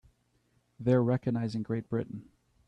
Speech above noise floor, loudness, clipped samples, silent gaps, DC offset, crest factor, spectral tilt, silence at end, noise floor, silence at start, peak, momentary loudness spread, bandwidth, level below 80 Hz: 42 dB; -31 LUFS; under 0.1%; none; under 0.1%; 18 dB; -9.5 dB/octave; 0.45 s; -72 dBFS; 0.8 s; -14 dBFS; 12 LU; 9.2 kHz; -64 dBFS